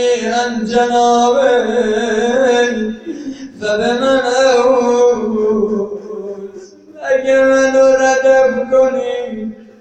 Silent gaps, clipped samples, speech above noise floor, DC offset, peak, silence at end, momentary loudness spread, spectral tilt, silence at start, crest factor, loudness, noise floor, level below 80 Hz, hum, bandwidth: none; under 0.1%; 23 dB; under 0.1%; 0 dBFS; 0.15 s; 16 LU; -3.5 dB/octave; 0 s; 12 dB; -13 LUFS; -35 dBFS; -48 dBFS; none; 8.8 kHz